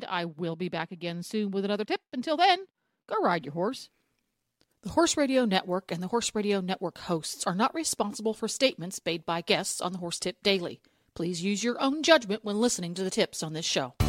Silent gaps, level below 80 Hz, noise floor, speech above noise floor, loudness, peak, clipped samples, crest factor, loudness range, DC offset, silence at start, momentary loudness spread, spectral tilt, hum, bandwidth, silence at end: none; -54 dBFS; -79 dBFS; 50 dB; -29 LUFS; -6 dBFS; under 0.1%; 22 dB; 2 LU; under 0.1%; 0 s; 10 LU; -3.5 dB/octave; none; 16 kHz; 0 s